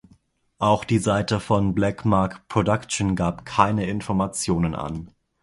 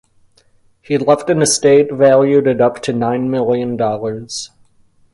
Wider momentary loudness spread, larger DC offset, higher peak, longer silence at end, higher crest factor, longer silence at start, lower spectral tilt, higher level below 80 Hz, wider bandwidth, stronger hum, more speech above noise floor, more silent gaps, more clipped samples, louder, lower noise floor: second, 5 LU vs 12 LU; neither; about the same, 0 dBFS vs 0 dBFS; second, 0.35 s vs 0.65 s; first, 22 dB vs 14 dB; second, 0.6 s vs 0.9 s; first, -6 dB/octave vs -4.5 dB/octave; first, -44 dBFS vs -54 dBFS; about the same, 11.5 kHz vs 11.5 kHz; neither; about the same, 37 dB vs 39 dB; neither; neither; second, -23 LUFS vs -14 LUFS; first, -59 dBFS vs -53 dBFS